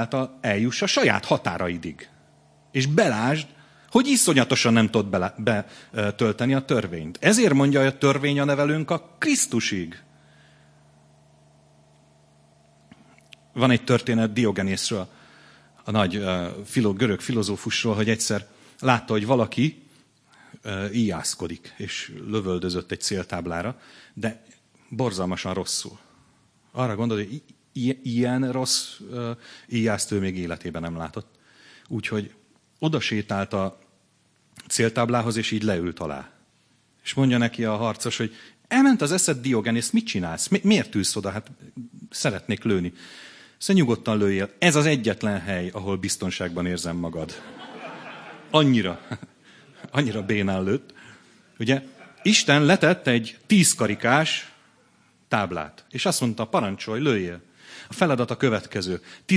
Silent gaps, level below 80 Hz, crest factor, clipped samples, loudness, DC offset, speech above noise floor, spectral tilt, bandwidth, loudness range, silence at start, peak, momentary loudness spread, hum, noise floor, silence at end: none; -60 dBFS; 24 dB; under 0.1%; -23 LUFS; under 0.1%; 40 dB; -4.5 dB/octave; 11 kHz; 8 LU; 0 s; 0 dBFS; 16 LU; none; -64 dBFS; 0 s